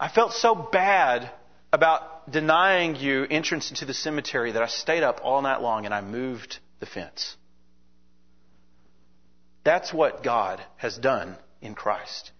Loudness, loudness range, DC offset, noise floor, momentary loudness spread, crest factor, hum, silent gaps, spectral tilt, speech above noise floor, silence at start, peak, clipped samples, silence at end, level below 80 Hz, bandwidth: -24 LUFS; 12 LU; 0.3%; -64 dBFS; 14 LU; 22 dB; none; none; -3.5 dB/octave; 40 dB; 0 s; -4 dBFS; under 0.1%; 0.1 s; -64 dBFS; 6.6 kHz